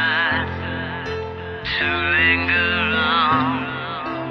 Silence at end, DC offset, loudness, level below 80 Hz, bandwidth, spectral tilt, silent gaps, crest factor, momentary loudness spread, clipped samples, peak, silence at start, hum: 0 s; under 0.1%; -19 LUFS; -48 dBFS; 6.8 kHz; -6.5 dB/octave; none; 16 dB; 12 LU; under 0.1%; -4 dBFS; 0 s; none